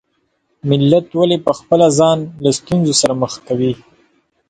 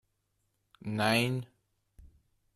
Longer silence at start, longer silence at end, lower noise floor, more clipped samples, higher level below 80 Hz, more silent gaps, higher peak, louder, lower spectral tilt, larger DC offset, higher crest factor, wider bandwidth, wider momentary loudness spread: second, 0.65 s vs 0.85 s; first, 0.75 s vs 0.5 s; second, -65 dBFS vs -78 dBFS; neither; first, -50 dBFS vs -64 dBFS; neither; first, 0 dBFS vs -14 dBFS; first, -15 LUFS vs -30 LUFS; about the same, -5.5 dB/octave vs -5 dB/octave; neither; second, 16 dB vs 22 dB; second, 11 kHz vs 14 kHz; second, 8 LU vs 19 LU